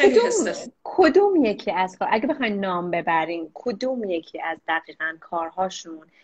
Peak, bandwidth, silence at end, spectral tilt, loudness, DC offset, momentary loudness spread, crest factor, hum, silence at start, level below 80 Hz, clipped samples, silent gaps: -4 dBFS; 9 kHz; 0.25 s; -4 dB/octave; -23 LUFS; under 0.1%; 12 LU; 18 dB; none; 0 s; -62 dBFS; under 0.1%; none